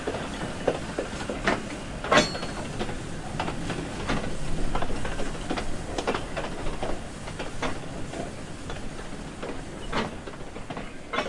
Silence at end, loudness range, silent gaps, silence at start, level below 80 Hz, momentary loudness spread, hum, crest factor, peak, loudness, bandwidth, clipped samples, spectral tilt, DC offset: 0 s; 7 LU; none; 0 s; -38 dBFS; 10 LU; none; 24 dB; -6 dBFS; -31 LUFS; 11.5 kHz; under 0.1%; -4.5 dB/octave; under 0.1%